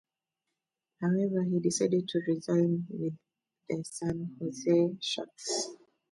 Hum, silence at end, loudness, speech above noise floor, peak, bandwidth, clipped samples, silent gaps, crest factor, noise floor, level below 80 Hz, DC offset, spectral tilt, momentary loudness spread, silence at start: none; 0.35 s; -31 LUFS; 57 dB; -16 dBFS; 11.5 kHz; under 0.1%; none; 16 dB; -87 dBFS; -68 dBFS; under 0.1%; -5.5 dB/octave; 10 LU; 1 s